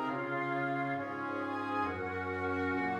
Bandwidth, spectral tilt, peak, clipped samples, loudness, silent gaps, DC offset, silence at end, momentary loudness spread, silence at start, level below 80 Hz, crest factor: 9.4 kHz; -7.5 dB/octave; -22 dBFS; under 0.1%; -35 LUFS; none; under 0.1%; 0 s; 3 LU; 0 s; -68 dBFS; 12 dB